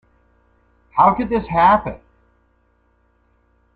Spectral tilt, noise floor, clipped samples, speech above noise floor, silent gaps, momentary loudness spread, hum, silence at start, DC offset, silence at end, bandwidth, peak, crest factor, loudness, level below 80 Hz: -9 dB/octave; -61 dBFS; under 0.1%; 45 dB; none; 16 LU; none; 0.95 s; under 0.1%; 1.8 s; 5 kHz; -2 dBFS; 18 dB; -16 LUFS; -44 dBFS